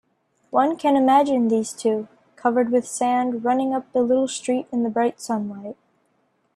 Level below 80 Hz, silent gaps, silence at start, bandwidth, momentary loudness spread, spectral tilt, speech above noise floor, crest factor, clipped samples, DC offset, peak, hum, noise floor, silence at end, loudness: -70 dBFS; none; 0.55 s; 13 kHz; 10 LU; -4.5 dB/octave; 46 dB; 16 dB; under 0.1%; under 0.1%; -6 dBFS; none; -67 dBFS; 0.8 s; -21 LUFS